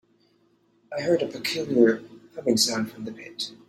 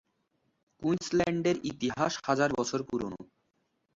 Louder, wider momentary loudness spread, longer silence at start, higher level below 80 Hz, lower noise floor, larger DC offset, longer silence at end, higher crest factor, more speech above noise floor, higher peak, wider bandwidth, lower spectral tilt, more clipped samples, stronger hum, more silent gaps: first, -24 LUFS vs -31 LUFS; first, 16 LU vs 8 LU; about the same, 0.9 s vs 0.8 s; second, -68 dBFS vs -62 dBFS; second, -64 dBFS vs -77 dBFS; neither; second, 0.15 s vs 0.7 s; about the same, 22 dB vs 18 dB; second, 40 dB vs 47 dB; first, -4 dBFS vs -12 dBFS; first, 16 kHz vs 7.8 kHz; second, -3.5 dB/octave vs -5 dB/octave; neither; neither; neither